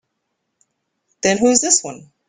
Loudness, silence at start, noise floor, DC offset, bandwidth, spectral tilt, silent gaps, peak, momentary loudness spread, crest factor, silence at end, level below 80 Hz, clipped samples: -15 LUFS; 1.25 s; -74 dBFS; under 0.1%; 10 kHz; -2 dB/octave; none; 0 dBFS; 9 LU; 20 dB; 0.3 s; -58 dBFS; under 0.1%